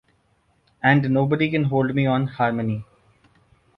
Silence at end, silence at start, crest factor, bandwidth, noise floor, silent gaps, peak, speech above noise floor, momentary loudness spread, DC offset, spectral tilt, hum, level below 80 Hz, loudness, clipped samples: 0.95 s; 0.85 s; 20 dB; 5.4 kHz; -64 dBFS; none; -4 dBFS; 44 dB; 7 LU; under 0.1%; -9.5 dB/octave; none; -56 dBFS; -21 LUFS; under 0.1%